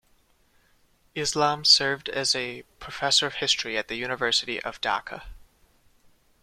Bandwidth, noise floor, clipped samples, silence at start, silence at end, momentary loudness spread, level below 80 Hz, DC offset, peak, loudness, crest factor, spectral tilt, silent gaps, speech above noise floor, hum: 16 kHz; -63 dBFS; under 0.1%; 1.15 s; 1.05 s; 19 LU; -56 dBFS; under 0.1%; -2 dBFS; -23 LUFS; 26 dB; -1.5 dB/octave; none; 37 dB; none